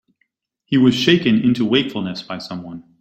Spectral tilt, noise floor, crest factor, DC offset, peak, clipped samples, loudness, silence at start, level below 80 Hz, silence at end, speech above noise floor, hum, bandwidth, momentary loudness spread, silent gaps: -6 dB/octave; -69 dBFS; 18 dB; under 0.1%; -2 dBFS; under 0.1%; -17 LUFS; 0.7 s; -56 dBFS; 0.2 s; 52 dB; none; 14 kHz; 15 LU; none